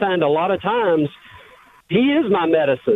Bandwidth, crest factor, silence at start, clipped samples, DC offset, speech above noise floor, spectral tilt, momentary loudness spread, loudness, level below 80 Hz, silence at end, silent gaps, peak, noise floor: 4.1 kHz; 14 dB; 0 s; under 0.1%; under 0.1%; 30 dB; -8 dB/octave; 4 LU; -18 LUFS; -56 dBFS; 0 s; none; -4 dBFS; -47 dBFS